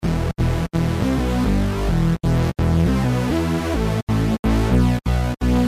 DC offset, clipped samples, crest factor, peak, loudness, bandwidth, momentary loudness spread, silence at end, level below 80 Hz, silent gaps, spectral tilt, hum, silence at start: under 0.1%; under 0.1%; 12 dB; -6 dBFS; -20 LUFS; 15.5 kHz; 3 LU; 0 s; -24 dBFS; 4.03-4.07 s, 4.39-4.43 s; -7 dB/octave; none; 0 s